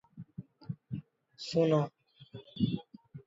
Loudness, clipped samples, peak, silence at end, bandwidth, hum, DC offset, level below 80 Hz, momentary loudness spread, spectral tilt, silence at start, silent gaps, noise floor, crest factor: -34 LUFS; under 0.1%; -16 dBFS; 0.05 s; 7.8 kHz; none; under 0.1%; -66 dBFS; 22 LU; -7.5 dB/octave; 0.15 s; none; -53 dBFS; 20 dB